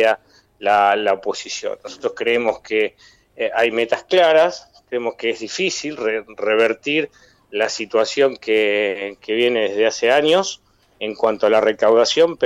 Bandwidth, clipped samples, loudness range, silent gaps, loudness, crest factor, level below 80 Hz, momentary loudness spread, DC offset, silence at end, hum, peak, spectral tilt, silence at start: 10.5 kHz; under 0.1%; 3 LU; none; -18 LUFS; 14 dB; -62 dBFS; 12 LU; under 0.1%; 0 s; none; -4 dBFS; -3 dB/octave; 0 s